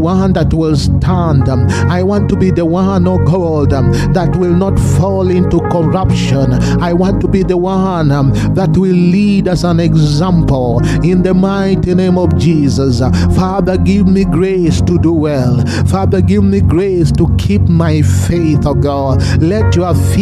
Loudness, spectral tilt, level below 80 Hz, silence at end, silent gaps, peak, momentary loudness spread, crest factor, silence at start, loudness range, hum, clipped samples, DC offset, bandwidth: -11 LUFS; -7.5 dB/octave; -24 dBFS; 0 s; none; 0 dBFS; 2 LU; 10 dB; 0 s; 1 LU; none; under 0.1%; under 0.1%; 13 kHz